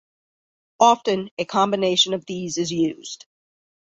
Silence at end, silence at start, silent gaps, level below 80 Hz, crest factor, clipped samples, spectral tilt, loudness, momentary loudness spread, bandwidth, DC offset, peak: 0.8 s; 0.8 s; 1.31-1.37 s; -66 dBFS; 20 dB; under 0.1%; -3.5 dB/octave; -21 LUFS; 14 LU; 8.4 kHz; under 0.1%; -2 dBFS